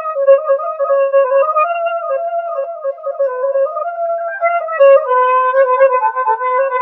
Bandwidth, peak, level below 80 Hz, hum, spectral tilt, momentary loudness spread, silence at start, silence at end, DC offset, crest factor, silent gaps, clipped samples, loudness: 3.8 kHz; 0 dBFS; -88 dBFS; none; -2 dB/octave; 9 LU; 0 s; 0 s; under 0.1%; 14 dB; none; under 0.1%; -14 LUFS